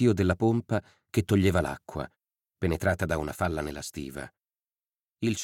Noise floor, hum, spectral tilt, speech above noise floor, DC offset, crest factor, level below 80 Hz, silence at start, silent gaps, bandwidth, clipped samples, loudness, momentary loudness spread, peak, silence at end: under -90 dBFS; none; -6.5 dB/octave; over 63 dB; under 0.1%; 18 dB; -48 dBFS; 0 s; none; 17 kHz; under 0.1%; -29 LUFS; 14 LU; -10 dBFS; 0 s